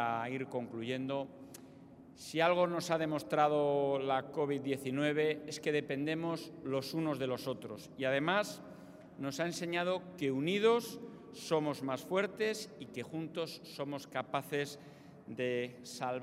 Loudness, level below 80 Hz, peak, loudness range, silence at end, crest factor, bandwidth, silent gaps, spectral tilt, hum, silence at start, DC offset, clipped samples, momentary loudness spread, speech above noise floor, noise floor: -36 LUFS; -78 dBFS; -16 dBFS; 5 LU; 0 s; 20 dB; 16 kHz; none; -5 dB/octave; none; 0 s; under 0.1%; under 0.1%; 16 LU; 20 dB; -56 dBFS